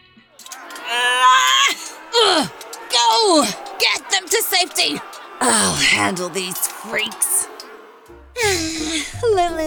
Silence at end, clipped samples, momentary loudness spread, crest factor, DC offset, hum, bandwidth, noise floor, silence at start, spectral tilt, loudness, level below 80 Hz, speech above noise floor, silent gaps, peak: 0 s; under 0.1%; 15 LU; 16 dB; under 0.1%; none; 19.5 kHz; -44 dBFS; 0.4 s; -1 dB/octave; -17 LUFS; -48 dBFS; 26 dB; none; -4 dBFS